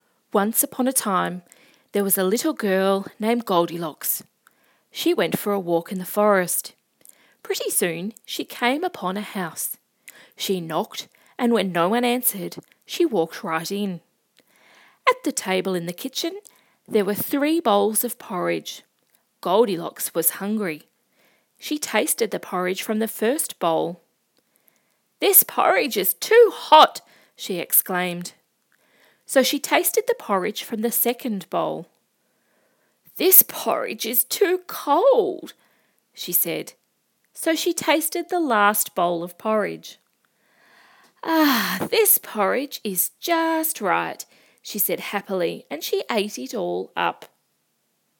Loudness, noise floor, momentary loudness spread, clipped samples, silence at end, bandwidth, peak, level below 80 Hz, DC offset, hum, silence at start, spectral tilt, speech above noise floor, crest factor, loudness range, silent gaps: -21 LUFS; -70 dBFS; 13 LU; under 0.1%; 0.95 s; 18 kHz; 0 dBFS; -80 dBFS; under 0.1%; none; 0.35 s; -3 dB/octave; 49 dB; 24 dB; 7 LU; none